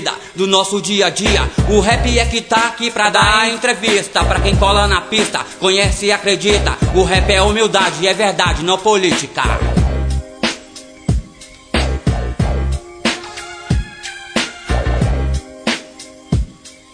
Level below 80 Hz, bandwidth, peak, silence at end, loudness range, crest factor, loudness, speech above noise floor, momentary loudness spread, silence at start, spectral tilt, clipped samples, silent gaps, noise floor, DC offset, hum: -22 dBFS; 10 kHz; 0 dBFS; 0.2 s; 7 LU; 16 dB; -15 LUFS; 25 dB; 10 LU; 0 s; -4 dB/octave; under 0.1%; none; -39 dBFS; under 0.1%; none